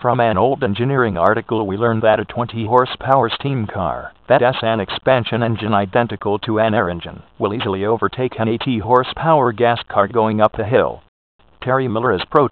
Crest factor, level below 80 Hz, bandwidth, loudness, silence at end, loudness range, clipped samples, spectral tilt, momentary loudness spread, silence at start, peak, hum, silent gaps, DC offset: 18 dB; -48 dBFS; 4.6 kHz; -17 LUFS; 0 s; 2 LU; under 0.1%; -9.5 dB/octave; 8 LU; 0 s; 0 dBFS; none; 11.08-11.39 s; 0.2%